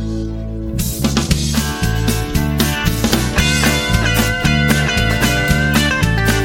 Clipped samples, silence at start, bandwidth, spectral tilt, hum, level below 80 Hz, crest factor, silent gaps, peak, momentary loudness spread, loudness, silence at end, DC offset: under 0.1%; 0 s; 17 kHz; -4.5 dB/octave; none; -22 dBFS; 16 dB; none; 0 dBFS; 7 LU; -15 LUFS; 0 s; under 0.1%